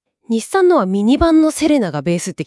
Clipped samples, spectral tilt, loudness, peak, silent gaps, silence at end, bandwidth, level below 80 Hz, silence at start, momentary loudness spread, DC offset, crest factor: under 0.1%; -5.5 dB/octave; -15 LUFS; -2 dBFS; none; 0 s; 12 kHz; -38 dBFS; 0.3 s; 8 LU; under 0.1%; 12 dB